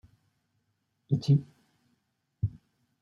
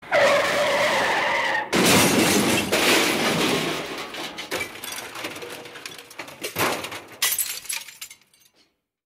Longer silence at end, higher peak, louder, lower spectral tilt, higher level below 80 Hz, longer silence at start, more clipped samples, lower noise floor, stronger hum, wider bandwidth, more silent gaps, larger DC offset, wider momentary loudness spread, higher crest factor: second, 0.5 s vs 0.95 s; second, -12 dBFS vs -6 dBFS; second, -30 LUFS vs -21 LUFS; first, -9 dB/octave vs -2.5 dB/octave; about the same, -60 dBFS vs -56 dBFS; first, 1.1 s vs 0 s; neither; first, -77 dBFS vs -65 dBFS; neither; second, 7 kHz vs 16 kHz; neither; neither; second, 10 LU vs 19 LU; about the same, 20 dB vs 18 dB